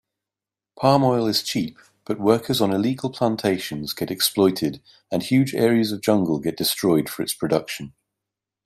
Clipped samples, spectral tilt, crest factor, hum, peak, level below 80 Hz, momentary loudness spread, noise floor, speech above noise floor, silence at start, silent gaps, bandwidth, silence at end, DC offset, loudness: under 0.1%; -5 dB/octave; 20 dB; none; -4 dBFS; -60 dBFS; 10 LU; -89 dBFS; 68 dB; 0.8 s; none; 16 kHz; 0.75 s; under 0.1%; -22 LUFS